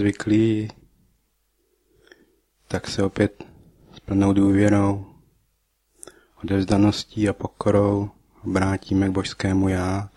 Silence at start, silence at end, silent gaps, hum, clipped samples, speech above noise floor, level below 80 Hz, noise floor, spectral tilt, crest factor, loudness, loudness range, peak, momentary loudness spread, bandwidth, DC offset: 0 s; 0.1 s; none; none; under 0.1%; 48 dB; -48 dBFS; -69 dBFS; -7 dB/octave; 18 dB; -22 LUFS; 6 LU; -4 dBFS; 11 LU; 12 kHz; under 0.1%